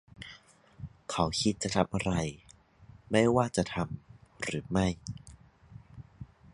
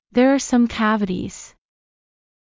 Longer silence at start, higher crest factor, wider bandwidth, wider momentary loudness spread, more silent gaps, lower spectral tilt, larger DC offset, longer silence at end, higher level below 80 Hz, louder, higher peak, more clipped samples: about the same, 0.2 s vs 0.15 s; first, 24 dB vs 16 dB; first, 11.5 kHz vs 7.6 kHz; first, 23 LU vs 14 LU; neither; about the same, -5 dB/octave vs -5 dB/octave; neither; second, 0.3 s vs 0.95 s; about the same, -52 dBFS vs -50 dBFS; second, -31 LUFS vs -19 LUFS; second, -10 dBFS vs -4 dBFS; neither